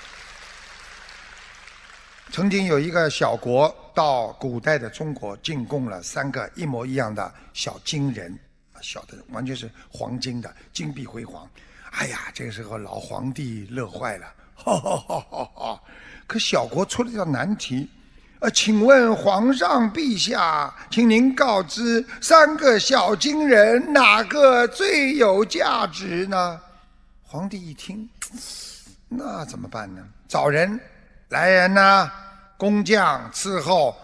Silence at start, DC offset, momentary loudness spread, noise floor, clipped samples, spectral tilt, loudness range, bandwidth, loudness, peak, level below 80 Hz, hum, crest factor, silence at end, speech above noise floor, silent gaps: 0 s; under 0.1%; 21 LU; -52 dBFS; under 0.1%; -4 dB/octave; 15 LU; 11 kHz; -20 LUFS; 0 dBFS; -52 dBFS; none; 22 dB; 0.1 s; 31 dB; none